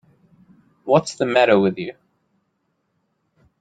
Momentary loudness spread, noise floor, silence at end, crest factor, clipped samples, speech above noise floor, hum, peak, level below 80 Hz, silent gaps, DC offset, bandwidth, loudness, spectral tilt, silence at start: 17 LU; -71 dBFS; 1.7 s; 20 dB; under 0.1%; 54 dB; none; -2 dBFS; -64 dBFS; none; under 0.1%; 9.4 kHz; -18 LUFS; -5.5 dB/octave; 0.85 s